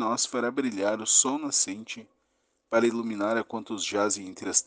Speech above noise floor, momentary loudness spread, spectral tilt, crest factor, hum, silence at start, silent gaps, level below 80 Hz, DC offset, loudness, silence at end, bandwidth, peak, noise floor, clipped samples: 46 dB; 11 LU; -1.5 dB/octave; 22 dB; none; 0 s; none; -76 dBFS; under 0.1%; -26 LUFS; 0.05 s; 10.5 kHz; -6 dBFS; -74 dBFS; under 0.1%